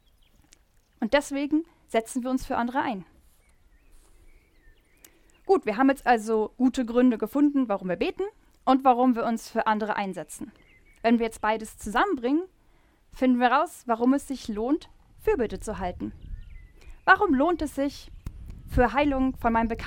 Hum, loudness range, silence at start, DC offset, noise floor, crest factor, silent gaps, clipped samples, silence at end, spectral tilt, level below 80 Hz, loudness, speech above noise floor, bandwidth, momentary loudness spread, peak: none; 6 LU; 1 s; under 0.1%; -60 dBFS; 22 dB; none; under 0.1%; 0 s; -5.5 dB/octave; -44 dBFS; -25 LUFS; 36 dB; 16.5 kHz; 16 LU; -4 dBFS